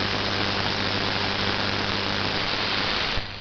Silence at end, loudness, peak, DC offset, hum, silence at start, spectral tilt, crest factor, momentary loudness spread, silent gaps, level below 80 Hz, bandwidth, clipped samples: 0 s; -24 LUFS; -6 dBFS; under 0.1%; none; 0 s; -4 dB/octave; 20 dB; 1 LU; none; -42 dBFS; 7 kHz; under 0.1%